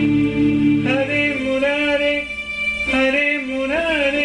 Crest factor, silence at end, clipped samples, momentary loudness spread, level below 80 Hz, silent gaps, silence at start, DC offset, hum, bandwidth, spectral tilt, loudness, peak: 12 dB; 0 s; under 0.1%; 5 LU; -42 dBFS; none; 0 s; under 0.1%; none; 10.5 kHz; -5.5 dB/octave; -18 LUFS; -6 dBFS